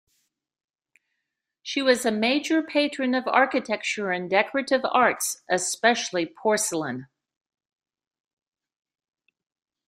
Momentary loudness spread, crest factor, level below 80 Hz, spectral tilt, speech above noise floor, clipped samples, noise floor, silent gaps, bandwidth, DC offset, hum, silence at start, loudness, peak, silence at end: 7 LU; 22 dB; -74 dBFS; -2.5 dB/octave; 59 dB; under 0.1%; -82 dBFS; none; 15.5 kHz; under 0.1%; none; 1.65 s; -24 LUFS; -6 dBFS; 2.85 s